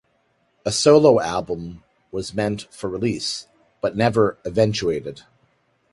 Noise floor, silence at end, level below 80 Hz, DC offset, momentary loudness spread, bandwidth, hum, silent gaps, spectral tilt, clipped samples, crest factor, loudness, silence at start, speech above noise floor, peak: -65 dBFS; 0.8 s; -52 dBFS; under 0.1%; 16 LU; 11.5 kHz; none; none; -5 dB/octave; under 0.1%; 20 dB; -21 LUFS; 0.65 s; 46 dB; -2 dBFS